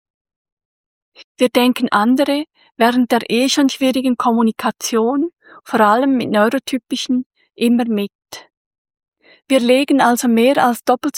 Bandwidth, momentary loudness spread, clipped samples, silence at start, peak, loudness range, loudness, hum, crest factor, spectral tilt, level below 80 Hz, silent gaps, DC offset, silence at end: 17 kHz; 9 LU; under 0.1%; 1.2 s; -2 dBFS; 3 LU; -16 LUFS; none; 16 dB; -4 dB/octave; -64 dBFS; 1.24-1.35 s, 7.26-7.30 s, 8.15-8.19 s, 8.57-8.71 s, 8.78-8.85 s, 9.08-9.12 s; under 0.1%; 0 s